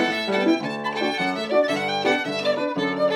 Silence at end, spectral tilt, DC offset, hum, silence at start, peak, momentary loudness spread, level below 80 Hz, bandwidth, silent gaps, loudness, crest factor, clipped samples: 0 s; -4.5 dB/octave; under 0.1%; none; 0 s; -8 dBFS; 3 LU; -72 dBFS; 15.5 kHz; none; -23 LUFS; 14 dB; under 0.1%